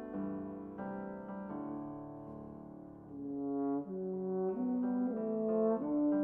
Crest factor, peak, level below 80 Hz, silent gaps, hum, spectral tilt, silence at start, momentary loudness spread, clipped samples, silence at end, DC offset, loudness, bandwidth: 14 dB; -22 dBFS; -70 dBFS; none; none; -11 dB/octave; 0 s; 16 LU; under 0.1%; 0 s; under 0.1%; -38 LUFS; 2.8 kHz